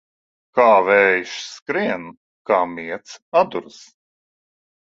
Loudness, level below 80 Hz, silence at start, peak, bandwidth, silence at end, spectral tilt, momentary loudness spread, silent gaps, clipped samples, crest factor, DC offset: -18 LUFS; -66 dBFS; 0.55 s; 0 dBFS; 7.8 kHz; 1.2 s; -4 dB/octave; 17 LU; 1.62-1.66 s, 2.17-2.45 s, 3.22-3.32 s; under 0.1%; 20 dB; under 0.1%